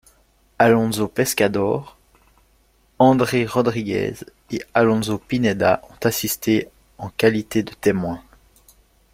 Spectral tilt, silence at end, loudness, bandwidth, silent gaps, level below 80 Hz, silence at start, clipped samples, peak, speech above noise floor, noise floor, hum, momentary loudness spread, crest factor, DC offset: -5 dB/octave; 0.95 s; -20 LUFS; 16.5 kHz; none; -52 dBFS; 0.6 s; under 0.1%; -2 dBFS; 40 dB; -59 dBFS; none; 13 LU; 20 dB; under 0.1%